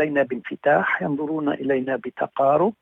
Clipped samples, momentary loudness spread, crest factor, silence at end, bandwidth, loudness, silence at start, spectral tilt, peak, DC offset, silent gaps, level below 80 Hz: under 0.1%; 7 LU; 16 dB; 0.1 s; 3.9 kHz; -22 LUFS; 0 s; -8.5 dB/octave; -6 dBFS; under 0.1%; none; -66 dBFS